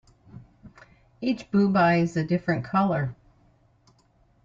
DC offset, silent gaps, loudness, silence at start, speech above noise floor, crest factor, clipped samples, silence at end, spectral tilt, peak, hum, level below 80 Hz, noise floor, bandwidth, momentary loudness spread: under 0.1%; none; -24 LUFS; 0.35 s; 39 dB; 18 dB; under 0.1%; 1.3 s; -8 dB/octave; -8 dBFS; none; -60 dBFS; -62 dBFS; 7.6 kHz; 9 LU